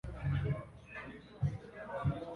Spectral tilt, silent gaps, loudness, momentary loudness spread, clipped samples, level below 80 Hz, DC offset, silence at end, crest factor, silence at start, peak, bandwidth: -8.5 dB/octave; none; -40 LUFS; 11 LU; under 0.1%; -50 dBFS; under 0.1%; 0 s; 16 dB; 0.05 s; -22 dBFS; 6.4 kHz